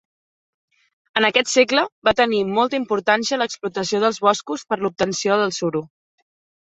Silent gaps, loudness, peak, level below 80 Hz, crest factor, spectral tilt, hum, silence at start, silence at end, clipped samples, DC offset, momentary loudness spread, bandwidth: 1.92-2.02 s; -20 LUFS; -2 dBFS; -58 dBFS; 20 dB; -3 dB/octave; none; 1.15 s; 0.8 s; under 0.1%; under 0.1%; 8 LU; 8.2 kHz